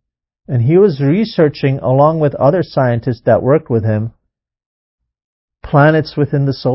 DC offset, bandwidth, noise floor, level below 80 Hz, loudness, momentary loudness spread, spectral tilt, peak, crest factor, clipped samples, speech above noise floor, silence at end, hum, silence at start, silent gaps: under 0.1%; 5.8 kHz; -72 dBFS; -44 dBFS; -13 LUFS; 6 LU; -12 dB/octave; 0 dBFS; 14 dB; under 0.1%; 60 dB; 0 s; none; 0.5 s; 4.66-4.98 s, 5.24-5.48 s